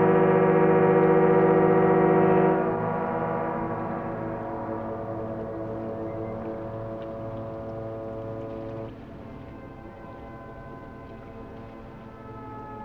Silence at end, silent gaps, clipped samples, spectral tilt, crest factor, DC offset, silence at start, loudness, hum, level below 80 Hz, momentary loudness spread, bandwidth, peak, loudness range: 0 s; none; under 0.1%; -10.5 dB/octave; 18 dB; under 0.1%; 0 s; -25 LUFS; none; -52 dBFS; 23 LU; 4.3 kHz; -8 dBFS; 20 LU